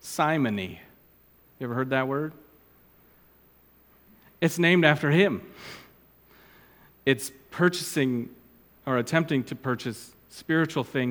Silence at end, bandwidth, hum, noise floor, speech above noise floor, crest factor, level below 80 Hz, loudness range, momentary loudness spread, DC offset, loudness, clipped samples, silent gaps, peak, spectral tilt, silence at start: 0 s; over 20 kHz; none; -59 dBFS; 33 dB; 26 dB; -66 dBFS; 8 LU; 21 LU; under 0.1%; -26 LUFS; under 0.1%; none; -2 dBFS; -5.5 dB/octave; 0.05 s